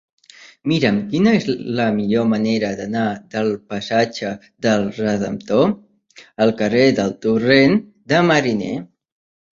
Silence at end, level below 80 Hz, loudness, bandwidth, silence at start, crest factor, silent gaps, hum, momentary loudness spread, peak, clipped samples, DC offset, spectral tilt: 0.7 s; -54 dBFS; -18 LUFS; 7.6 kHz; 0.4 s; 18 dB; none; none; 9 LU; -2 dBFS; under 0.1%; under 0.1%; -6 dB/octave